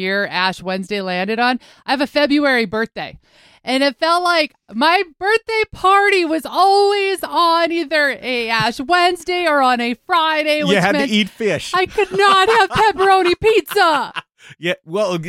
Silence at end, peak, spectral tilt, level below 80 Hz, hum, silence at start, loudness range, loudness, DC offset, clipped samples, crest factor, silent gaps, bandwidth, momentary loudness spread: 0 s; -2 dBFS; -4 dB/octave; -50 dBFS; none; 0 s; 3 LU; -16 LUFS; under 0.1%; under 0.1%; 14 dB; none; 16.5 kHz; 9 LU